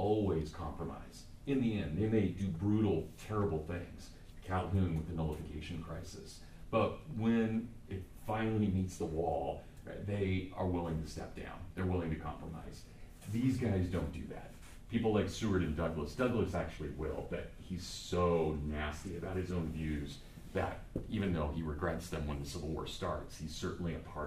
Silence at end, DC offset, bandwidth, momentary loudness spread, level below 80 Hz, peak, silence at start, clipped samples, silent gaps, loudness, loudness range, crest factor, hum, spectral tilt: 0 s; under 0.1%; 15 kHz; 14 LU; -50 dBFS; -20 dBFS; 0 s; under 0.1%; none; -38 LUFS; 3 LU; 18 dB; none; -7 dB/octave